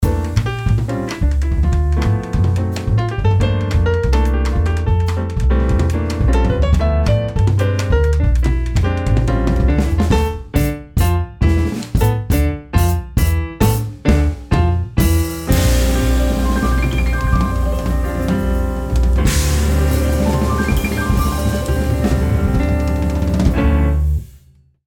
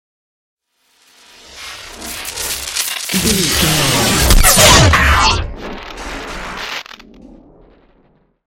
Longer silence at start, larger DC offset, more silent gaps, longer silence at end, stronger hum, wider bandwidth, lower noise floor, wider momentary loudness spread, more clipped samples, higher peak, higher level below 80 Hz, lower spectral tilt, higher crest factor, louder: second, 0 s vs 1.5 s; neither; neither; second, 0.5 s vs 1.2 s; neither; first, 19 kHz vs 17 kHz; second, -49 dBFS vs -57 dBFS; second, 3 LU vs 22 LU; neither; about the same, -2 dBFS vs 0 dBFS; about the same, -18 dBFS vs -22 dBFS; first, -6.5 dB/octave vs -2.5 dB/octave; about the same, 14 dB vs 16 dB; second, -17 LUFS vs -12 LUFS